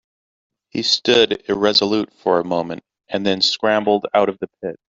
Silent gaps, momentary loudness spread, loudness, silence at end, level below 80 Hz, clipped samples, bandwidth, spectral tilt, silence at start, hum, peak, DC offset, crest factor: none; 14 LU; -17 LUFS; 0.15 s; -58 dBFS; under 0.1%; 7.8 kHz; -4 dB/octave; 0.75 s; none; 0 dBFS; under 0.1%; 18 dB